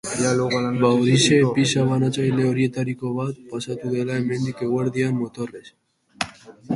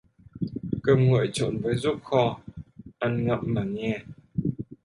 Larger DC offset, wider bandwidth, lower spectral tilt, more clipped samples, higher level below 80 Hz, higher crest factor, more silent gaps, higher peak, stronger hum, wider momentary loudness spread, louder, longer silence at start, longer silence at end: neither; about the same, 11.5 kHz vs 11.5 kHz; second, -5.5 dB/octave vs -7 dB/octave; neither; second, -58 dBFS vs -52 dBFS; about the same, 18 dB vs 20 dB; neither; about the same, -4 dBFS vs -6 dBFS; neither; about the same, 13 LU vs 13 LU; first, -21 LUFS vs -26 LUFS; second, 0.05 s vs 0.35 s; about the same, 0 s vs 0.1 s